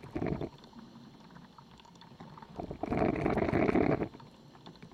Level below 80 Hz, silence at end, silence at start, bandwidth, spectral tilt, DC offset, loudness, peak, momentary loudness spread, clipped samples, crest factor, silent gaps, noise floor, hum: -52 dBFS; 0.05 s; 0 s; 10.5 kHz; -8.5 dB/octave; under 0.1%; -33 LUFS; -12 dBFS; 25 LU; under 0.1%; 24 dB; none; -55 dBFS; none